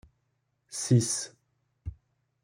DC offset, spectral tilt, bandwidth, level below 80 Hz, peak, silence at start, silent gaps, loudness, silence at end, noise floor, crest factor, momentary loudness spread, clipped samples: under 0.1%; -5 dB/octave; 16 kHz; -54 dBFS; -12 dBFS; 0.7 s; none; -28 LUFS; 0.5 s; -77 dBFS; 22 dB; 20 LU; under 0.1%